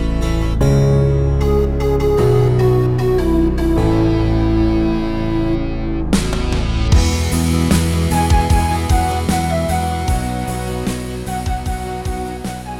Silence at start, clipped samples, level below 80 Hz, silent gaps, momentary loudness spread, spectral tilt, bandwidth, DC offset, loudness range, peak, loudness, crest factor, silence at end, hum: 0 s; under 0.1%; -20 dBFS; none; 9 LU; -6.5 dB/octave; 16.5 kHz; under 0.1%; 4 LU; -2 dBFS; -17 LUFS; 14 dB; 0 s; none